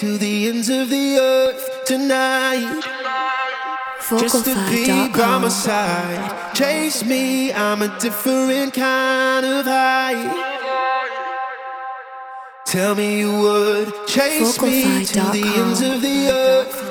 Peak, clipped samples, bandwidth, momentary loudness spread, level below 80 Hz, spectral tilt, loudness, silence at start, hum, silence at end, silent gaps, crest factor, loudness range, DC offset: -2 dBFS; under 0.1%; over 20 kHz; 9 LU; -56 dBFS; -3.5 dB/octave; -18 LUFS; 0 s; none; 0 s; none; 16 dB; 4 LU; under 0.1%